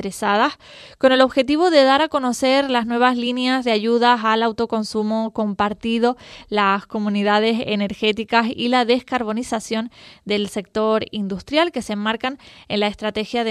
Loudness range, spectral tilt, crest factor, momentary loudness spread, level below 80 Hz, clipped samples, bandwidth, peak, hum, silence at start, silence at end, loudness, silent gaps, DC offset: 5 LU; -4.5 dB/octave; 20 dB; 9 LU; -54 dBFS; under 0.1%; 13.5 kHz; 0 dBFS; none; 0 s; 0 s; -19 LUFS; none; under 0.1%